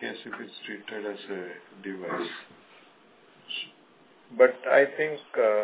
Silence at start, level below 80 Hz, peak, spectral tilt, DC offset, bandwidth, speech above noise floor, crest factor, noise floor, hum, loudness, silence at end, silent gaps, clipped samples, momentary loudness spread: 0 s; -86 dBFS; -6 dBFS; -7.5 dB/octave; under 0.1%; 4 kHz; 31 dB; 22 dB; -58 dBFS; none; -28 LUFS; 0 s; none; under 0.1%; 18 LU